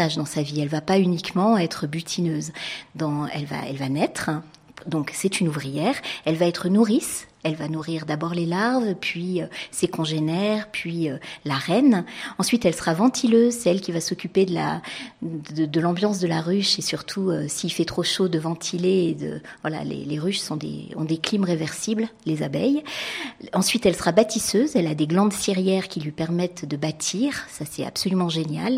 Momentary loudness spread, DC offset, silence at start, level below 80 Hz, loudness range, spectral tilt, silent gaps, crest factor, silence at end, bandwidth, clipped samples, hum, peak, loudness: 10 LU; under 0.1%; 0 s; -58 dBFS; 4 LU; -5 dB/octave; none; 20 dB; 0 s; 16 kHz; under 0.1%; none; -4 dBFS; -24 LUFS